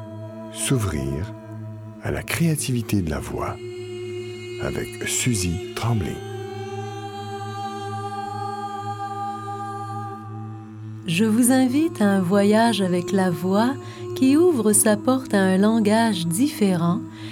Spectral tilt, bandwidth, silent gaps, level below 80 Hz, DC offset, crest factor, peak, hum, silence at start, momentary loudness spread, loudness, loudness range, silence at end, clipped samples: -5 dB/octave; 17.5 kHz; none; -46 dBFS; under 0.1%; 18 dB; -4 dBFS; none; 0 s; 16 LU; -22 LUFS; 11 LU; 0 s; under 0.1%